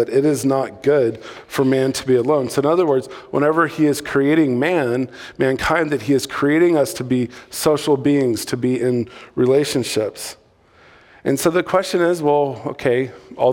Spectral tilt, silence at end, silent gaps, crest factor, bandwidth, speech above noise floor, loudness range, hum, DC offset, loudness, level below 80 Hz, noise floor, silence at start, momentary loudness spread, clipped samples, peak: -5.5 dB/octave; 0 s; none; 16 dB; 18 kHz; 33 dB; 3 LU; none; under 0.1%; -18 LUFS; -52 dBFS; -51 dBFS; 0 s; 7 LU; under 0.1%; -2 dBFS